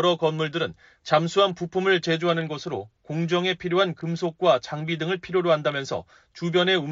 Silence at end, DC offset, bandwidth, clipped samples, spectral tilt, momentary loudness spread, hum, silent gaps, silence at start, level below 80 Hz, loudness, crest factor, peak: 0 s; under 0.1%; 7.6 kHz; under 0.1%; -3.5 dB/octave; 10 LU; none; none; 0 s; -64 dBFS; -24 LUFS; 16 dB; -8 dBFS